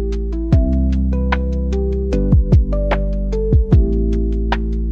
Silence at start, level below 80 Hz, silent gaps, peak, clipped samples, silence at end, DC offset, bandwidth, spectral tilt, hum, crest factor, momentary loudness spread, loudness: 0 s; -18 dBFS; none; -2 dBFS; under 0.1%; 0 s; 0.2%; 6.4 kHz; -9 dB/octave; none; 14 dB; 6 LU; -17 LUFS